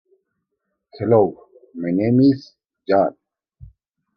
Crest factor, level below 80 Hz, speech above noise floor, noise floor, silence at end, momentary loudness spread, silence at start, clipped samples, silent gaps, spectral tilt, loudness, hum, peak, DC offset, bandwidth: 18 dB; -58 dBFS; 60 dB; -77 dBFS; 1.05 s; 14 LU; 0.95 s; under 0.1%; none; -10 dB/octave; -19 LUFS; none; -2 dBFS; under 0.1%; 6 kHz